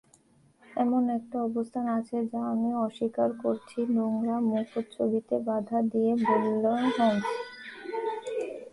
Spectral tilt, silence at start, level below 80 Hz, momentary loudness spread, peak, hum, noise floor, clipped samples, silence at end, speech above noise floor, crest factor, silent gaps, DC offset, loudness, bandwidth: -7 dB/octave; 0.7 s; -72 dBFS; 9 LU; -12 dBFS; none; -62 dBFS; under 0.1%; 0.05 s; 34 dB; 16 dB; none; under 0.1%; -29 LUFS; 11 kHz